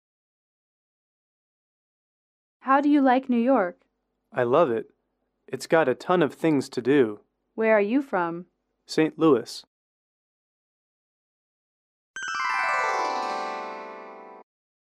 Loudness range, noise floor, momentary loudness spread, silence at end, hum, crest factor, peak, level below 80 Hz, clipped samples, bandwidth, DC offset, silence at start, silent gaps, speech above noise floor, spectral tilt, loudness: 6 LU; -76 dBFS; 18 LU; 0.5 s; none; 20 dB; -8 dBFS; -76 dBFS; under 0.1%; 13.5 kHz; under 0.1%; 2.65 s; 9.67-12.14 s; 54 dB; -5.5 dB/octave; -24 LUFS